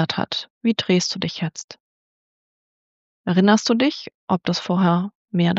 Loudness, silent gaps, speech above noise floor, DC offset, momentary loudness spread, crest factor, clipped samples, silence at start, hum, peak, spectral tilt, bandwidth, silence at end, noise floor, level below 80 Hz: -21 LUFS; 0.50-0.61 s, 1.64-1.68 s, 1.80-3.24 s, 4.14-4.28 s, 5.15-5.28 s; over 70 dB; under 0.1%; 13 LU; 18 dB; under 0.1%; 0 s; none; -4 dBFS; -5 dB/octave; 8 kHz; 0 s; under -90 dBFS; -66 dBFS